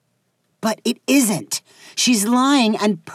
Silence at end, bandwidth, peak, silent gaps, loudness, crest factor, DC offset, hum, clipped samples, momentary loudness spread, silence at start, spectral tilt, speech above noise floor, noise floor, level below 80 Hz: 0 s; 16 kHz; -4 dBFS; none; -18 LUFS; 14 dB; under 0.1%; none; under 0.1%; 11 LU; 0.65 s; -3 dB/octave; 50 dB; -68 dBFS; -82 dBFS